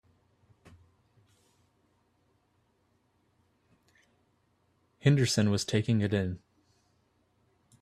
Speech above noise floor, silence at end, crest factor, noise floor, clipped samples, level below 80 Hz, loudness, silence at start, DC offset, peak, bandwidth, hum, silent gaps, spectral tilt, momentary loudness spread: 45 dB; 1.45 s; 24 dB; -72 dBFS; under 0.1%; -66 dBFS; -28 LUFS; 5.05 s; under 0.1%; -10 dBFS; 13.5 kHz; none; none; -5.5 dB/octave; 9 LU